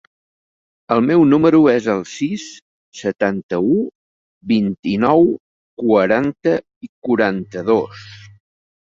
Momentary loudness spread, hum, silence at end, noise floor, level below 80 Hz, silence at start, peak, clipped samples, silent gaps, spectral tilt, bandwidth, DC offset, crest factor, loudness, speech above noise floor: 16 LU; none; 0.85 s; under -90 dBFS; -56 dBFS; 0.9 s; -2 dBFS; under 0.1%; 2.62-2.92 s, 3.43-3.49 s, 3.95-4.41 s, 4.79-4.83 s, 5.40-5.77 s, 6.76-6.81 s, 6.89-7.02 s; -7 dB/octave; 7.6 kHz; under 0.1%; 16 dB; -17 LUFS; over 74 dB